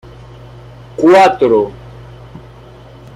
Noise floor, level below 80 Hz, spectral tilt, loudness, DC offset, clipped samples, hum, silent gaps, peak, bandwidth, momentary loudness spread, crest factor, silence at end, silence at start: -37 dBFS; -44 dBFS; -6 dB/octave; -10 LUFS; under 0.1%; under 0.1%; none; none; 0 dBFS; 12 kHz; 26 LU; 14 dB; 0.8 s; 1 s